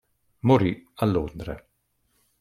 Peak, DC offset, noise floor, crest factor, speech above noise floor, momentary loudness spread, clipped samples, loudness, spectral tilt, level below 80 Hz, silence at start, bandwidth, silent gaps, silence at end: -6 dBFS; under 0.1%; -71 dBFS; 20 dB; 48 dB; 17 LU; under 0.1%; -24 LUFS; -8.5 dB/octave; -48 dBFS; 0.45 s; 14.5 kHz; none; 0.8 s